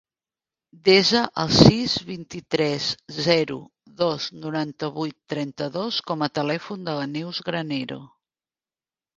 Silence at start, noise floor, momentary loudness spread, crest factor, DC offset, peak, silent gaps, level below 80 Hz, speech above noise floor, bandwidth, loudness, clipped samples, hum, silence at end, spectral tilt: 0.85 s; under -90 dBFS; 14 LU; 24 dB; under 0.1%; 0 dBFS; none; -48 dBFS; over 67 dB; 9.8 kHz; -23 LUFS; under 0.1%; none; 1.1 s; -5 dB/octave